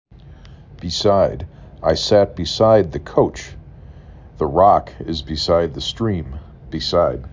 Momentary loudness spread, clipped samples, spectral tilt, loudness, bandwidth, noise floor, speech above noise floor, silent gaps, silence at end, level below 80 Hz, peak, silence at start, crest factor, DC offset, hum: 18 LU; under 0.1%; -5.5 dB/octave; -18 LUFS; 7.6 kHz; -41 dBFS; 23 dB; none; 0 s; -36 dBFS; -2 dBFS; 0.25 s; 18 dB; under 0.1%; none